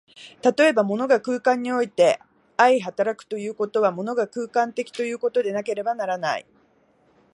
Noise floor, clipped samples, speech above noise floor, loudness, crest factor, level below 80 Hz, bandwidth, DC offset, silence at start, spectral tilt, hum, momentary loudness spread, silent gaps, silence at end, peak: -61 dBFS; under 0.1%; 39 dB; -23 LUFS; 20 dB; -76 dBFS; 11.5 kHz; under 0.1%; 0.2 s; -4.5 dB/octave; none; 9 LU; none; 0.95 s; -2 dBFS